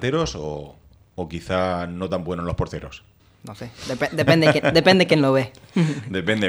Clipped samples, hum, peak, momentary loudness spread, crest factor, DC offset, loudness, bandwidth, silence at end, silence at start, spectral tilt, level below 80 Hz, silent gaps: under 0.1%; none; 0 dBFS; 19 LU; 22 dB; under 0.1%; -20 LUFS; 14.5 kHz; 0 s; 0 s; -6 dB/octave; -44 dBFS; none